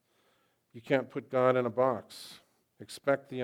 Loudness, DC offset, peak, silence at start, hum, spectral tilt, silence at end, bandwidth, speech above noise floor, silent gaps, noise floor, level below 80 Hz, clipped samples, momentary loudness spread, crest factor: -30 LUFS; under 0.1%; -12 dBFS; 0.75 s; none; -6 dB/octave; 0 s; 15.5 kHz; 41 dB; none; -72 dBFS; -86 dBFS; under 0.1%; 19 LU; 20 dB